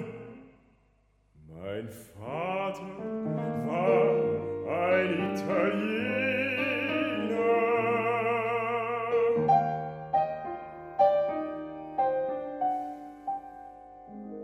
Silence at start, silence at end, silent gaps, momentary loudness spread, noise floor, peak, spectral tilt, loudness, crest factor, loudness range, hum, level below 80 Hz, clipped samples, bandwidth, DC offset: 0 s; 0 s; none; 16 LU; -67 dBFS; -12 dBFS; -7 dB/octave; -29 LUFS; 18 dB; 7 LU; none; -66 dBFS; under 0.1%; 13.5 kHz; under 0.1%